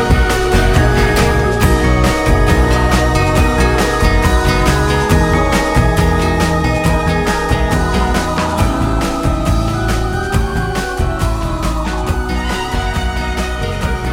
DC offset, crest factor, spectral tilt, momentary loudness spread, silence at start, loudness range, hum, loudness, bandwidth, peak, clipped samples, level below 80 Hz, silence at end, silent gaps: under 0.1%; 12 dB; -5.5 dB/octave; 6 LU; 0 s; 5 LU; none; -14 LUFS; 17 kHz; 0 dBFS; under 0.1%; -18 dBFS; 0 s; none